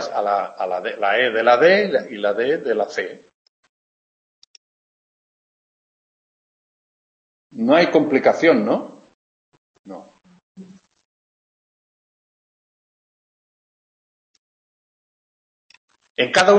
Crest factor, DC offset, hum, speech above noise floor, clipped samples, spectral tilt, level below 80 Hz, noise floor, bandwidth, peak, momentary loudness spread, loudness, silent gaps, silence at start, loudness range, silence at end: 22 dB; under 0.1%; none; 27 dB; under 0.1%; -4.5 dB/octave; -72 dBFS; -44 dBFS; 8.8 kHz; -2 dBFS; 21 LU; -18 LUFS; 3.34-3.63 s, 3.69-7.50 s, 9.14-9.52 s, 9.58-9.84 s, 10.42-10.55 s, 11.05-15.69 s, 15.77-15.88 s, 16.10-16.15 s; 0 s; 12 LU; 0 s